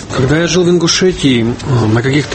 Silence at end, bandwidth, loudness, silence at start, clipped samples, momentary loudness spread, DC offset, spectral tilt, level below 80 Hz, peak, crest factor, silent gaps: 0 s; 8.8 kHz; -11 LUFS; 0 s; under 0.1%; 4 LU; under 0.1%; -5 dB/octave; -34 dBFS; 0 dBFS; 12 dB; none